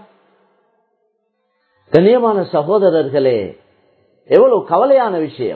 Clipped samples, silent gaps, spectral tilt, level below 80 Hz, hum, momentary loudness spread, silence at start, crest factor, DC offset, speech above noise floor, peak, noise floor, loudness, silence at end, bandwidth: under 0.1%; none; -9.5 dB/octave; -58 dBFS; none; 8 LU; 1.9 s; 16 dB; under 0.1%; 54 dB; 0 dBFS; -67 dBFS; -13 LUFS; 0 s; 5 kHz